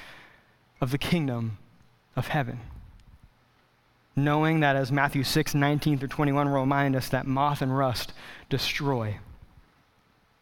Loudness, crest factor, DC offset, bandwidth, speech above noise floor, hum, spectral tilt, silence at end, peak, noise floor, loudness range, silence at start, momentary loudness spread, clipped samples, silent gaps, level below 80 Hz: -27 LUFS; 20 dB; under 0.1%; 18 kHz; 38 dB; none; -6 dB/octave; 1.05 s; -8 dBFS; -64 dBFS; 7 LU; 0 s; 13 LU; under 0.1%; none; -50 dBFS